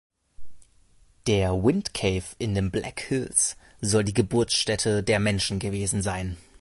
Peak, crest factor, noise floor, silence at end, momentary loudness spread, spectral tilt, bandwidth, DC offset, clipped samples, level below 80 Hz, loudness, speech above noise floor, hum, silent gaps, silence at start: -6 dBFS; 20 dB; -58 dBFS; 0.2 s; 7 LU; -4 dB/octave; 11.5 kHz; under 0.1%; under 0.1%; -44 dBFS; -25 LUFS; 33 dB; none; none; 0.4 s